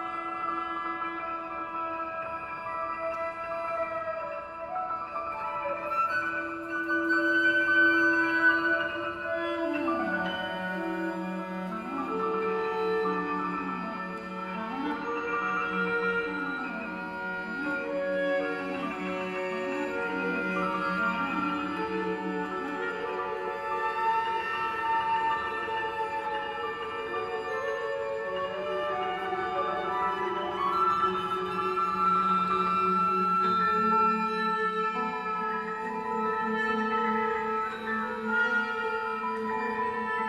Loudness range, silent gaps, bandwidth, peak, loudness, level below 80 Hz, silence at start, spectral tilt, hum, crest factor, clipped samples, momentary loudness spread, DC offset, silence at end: 7 LU; none; 13.5 kHz; -14 dBFS; -29 LUFS; -62 dBFS; 0 s; -5.5 dB/octave; none; 16 dB; under 0.1%; 9 LU; under 0.1%; 0 s